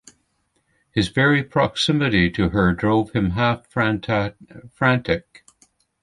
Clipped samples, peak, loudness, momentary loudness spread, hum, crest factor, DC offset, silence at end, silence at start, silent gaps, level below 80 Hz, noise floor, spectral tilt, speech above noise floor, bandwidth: under 0.1%; -2 dBFS; -20 LUFS; 6 LU; none; 20 dB; under 0.1%; 0.85 s; 0.95 s; none; -42 dBFS; -68 dBFS; -6 dB/octave; 48 dB; 11.5 kHz